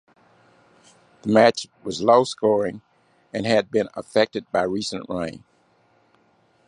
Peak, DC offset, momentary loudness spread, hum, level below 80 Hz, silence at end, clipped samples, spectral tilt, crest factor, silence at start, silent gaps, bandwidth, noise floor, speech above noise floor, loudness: -2 dBFS; under 0.1%; 15 LU; none; -60 dBFS; 1.3 s; under 0.1%; -5 dB/octave; 22 dB; 1.25 s; none; 11 kHz; -61 dBFS; 40 dB; -22 LUFS